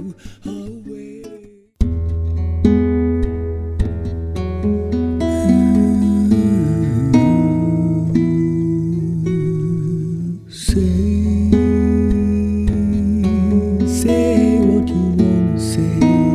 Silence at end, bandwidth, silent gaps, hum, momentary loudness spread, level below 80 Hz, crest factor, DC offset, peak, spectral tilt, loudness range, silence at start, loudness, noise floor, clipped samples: 0 s; 13.5 kHz; none; none; 10 LU; -26 dBFS; 16 dB; under 0.1%; 0 dBFS; -8 dB/octave; 5 LU; 0 s; -17 LUFS; -40 dBFS; under 0.1%